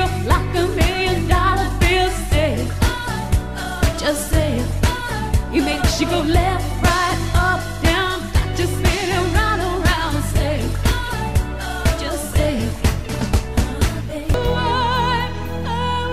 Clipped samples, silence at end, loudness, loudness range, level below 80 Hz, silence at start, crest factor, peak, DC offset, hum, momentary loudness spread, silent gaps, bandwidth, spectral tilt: under 0.1%; 0 s; -19 LUFS; 3 LU; -24 dBFS; 0 s; 16 dB; -2 dBFS; 1%; none; 5 LU; none; 15.5 kHz; -5 dB/octave